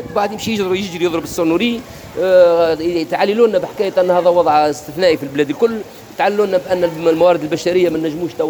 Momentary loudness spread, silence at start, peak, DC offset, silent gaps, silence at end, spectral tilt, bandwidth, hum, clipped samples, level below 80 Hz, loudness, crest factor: 7 LU; 0 s; 0 dBFS; under 0.1%; none; 0 s; -5 dB/octave; over 20 kHz; none; under 0.1%; -50 dBFS; -15 LUFS; 14 dB